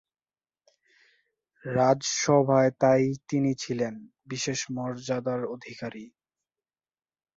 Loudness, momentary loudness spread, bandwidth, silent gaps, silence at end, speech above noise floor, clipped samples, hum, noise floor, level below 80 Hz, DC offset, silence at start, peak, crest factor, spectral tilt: -26 LUFS; 16 LU; 8 kHz; none; 1.3 s; over 64 dB; under 0.1%; none; under -90 dBFS; -68 dBFS; under 0.1%; 1.65 s; -8 dBFS; 20 dB; -5 dB/octave